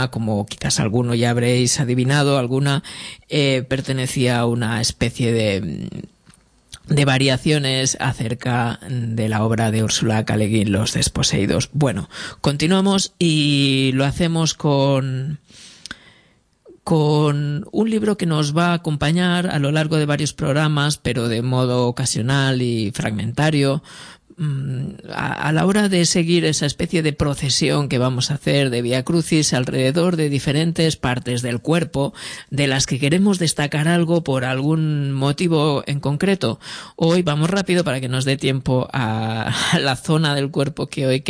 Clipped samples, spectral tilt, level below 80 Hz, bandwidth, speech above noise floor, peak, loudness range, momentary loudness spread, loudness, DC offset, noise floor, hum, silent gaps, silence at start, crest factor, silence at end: under 0.1%; -5 dB/octave; -46 dBFS; 11 kHz; 38 dB; -2 dBFS; 3 LU; 7 LU; -19 LUFS; under 0.1%; -57 dBFS; none; none; 0 s; 16 dB; 0 s